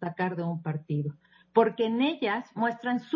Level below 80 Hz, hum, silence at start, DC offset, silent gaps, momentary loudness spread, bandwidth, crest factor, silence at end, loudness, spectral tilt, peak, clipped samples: -76 dBFS; none; 0 s; under 0.1%; none; 7 LU; 7 kHz; 20 dB; 0 s; -29 LUFS; -8.5 dB/octave; -8 dBFS; under 0.1%